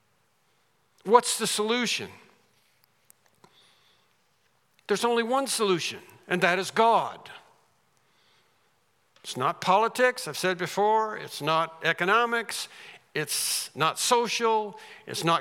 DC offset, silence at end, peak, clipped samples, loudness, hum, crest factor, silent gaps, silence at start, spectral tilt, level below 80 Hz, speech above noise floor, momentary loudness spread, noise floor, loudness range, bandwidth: under 0.1%; 0 s; -4 dBFS; under 0.1%; -25 LUFS; none; 24 dB; none; 1.05 s; -2.5 dB/octave; -84 dBFS; 43 dB; 15 LU; -69 dBFS; 6 LU; 17.5 kHz